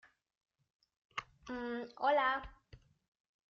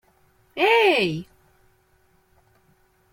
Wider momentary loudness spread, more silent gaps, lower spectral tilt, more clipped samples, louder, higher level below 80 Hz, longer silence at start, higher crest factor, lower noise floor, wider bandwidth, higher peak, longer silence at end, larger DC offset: second, 15 LU vs 18 LU; neither; second, -1 dB/octave vs -5 dB/octave; neither; second, -37 LUFS vs -20 LUFS; about the same, -66 dBFS vs -64 dBFS; first, 1.15 s vs 0.55 s; about the same, 20 dB vs 20 dB; about the same, -63 dBFS vs -62 dBFS; second, 7.2 kHz vs 16.5 kHz; second, -20 dBFS vs -6 dBFS; second, 0.75 s vs 1.9 s; neither